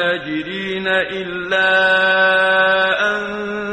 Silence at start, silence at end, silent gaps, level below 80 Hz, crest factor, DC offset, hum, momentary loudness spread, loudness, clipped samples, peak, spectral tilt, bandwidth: 0 s; 0 s; none; -52 dBFS; 14 dB; under 0.1%; none; 11 LU; -16 LUFS; under 0.1%; -4 dBFS; -4.5 dB/octave; 9.2 kHz